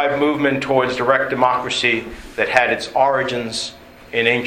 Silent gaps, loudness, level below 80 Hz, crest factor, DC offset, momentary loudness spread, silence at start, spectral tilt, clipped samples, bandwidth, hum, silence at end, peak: none; -18 LUFS; -48 dBFS; 18 dB; under 0.1%; 8 LU; 0 s; -4 dB/octave; under 0.1%; 16 kHz; none; 0 s; 0 dBFS